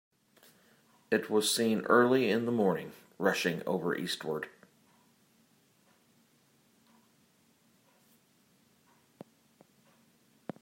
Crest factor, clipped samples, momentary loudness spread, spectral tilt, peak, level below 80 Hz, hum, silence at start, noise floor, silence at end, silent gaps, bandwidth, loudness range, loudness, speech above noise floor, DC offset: 24 dB; under 0.1%; 15 LU; -4 dB/octave; -10 dBFS; -82 dBFS; none; 1.1 s; -68 dBFS; 6.15 s; none; 16 kHz; 13 LU; -30 LUFS; 39 dB; under 0.1%